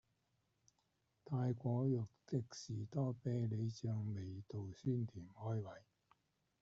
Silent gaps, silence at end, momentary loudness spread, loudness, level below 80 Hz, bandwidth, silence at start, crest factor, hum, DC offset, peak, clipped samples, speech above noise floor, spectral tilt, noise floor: none; 0.85 s; 9 LU; -43 LUFS; -76 dBFS; 7.6 kHz; 1.25 s; 16 dB; none; under 0.1%; -26 dBFS; under 0.1%; 41 dB; -9 dB/octave; -83 dBFS